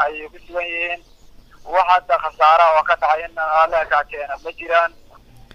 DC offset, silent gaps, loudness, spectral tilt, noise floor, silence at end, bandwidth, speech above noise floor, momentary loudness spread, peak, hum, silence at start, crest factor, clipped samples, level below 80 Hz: under 0.1%; none; -17 LUFS; -3 dB/octave; -45 dBFS; 0.65 s; 10.5 kHz; 27 dB; 15 LU; -2 dBFS; none; 0 s; 18 dB; under 0.1%; -48 dBFS